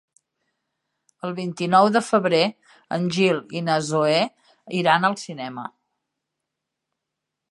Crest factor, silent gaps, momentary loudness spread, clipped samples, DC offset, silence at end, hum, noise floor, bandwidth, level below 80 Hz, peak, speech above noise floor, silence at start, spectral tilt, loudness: 20 dB; none; 14 LU; under 0.1%; under 0.1%; 1.8 s; none; -83 dBFS; 11.5 kHz; -74 dBFS; -2 dBFS; 62 dB; 1.25 s; -5 dB/octave; -21 LUFS